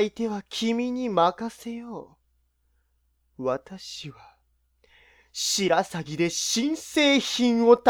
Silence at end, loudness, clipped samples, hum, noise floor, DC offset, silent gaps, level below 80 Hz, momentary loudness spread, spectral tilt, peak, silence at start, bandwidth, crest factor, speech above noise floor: 0 s; -25 LUFS; under 0.1%; none; -70 dBFS; under 0.1%; none; -64 dBFS; 17 LU; -3.5 dB/octave; -4 dBFS; 0 s; 18 kHz; 22 dB; 45 dB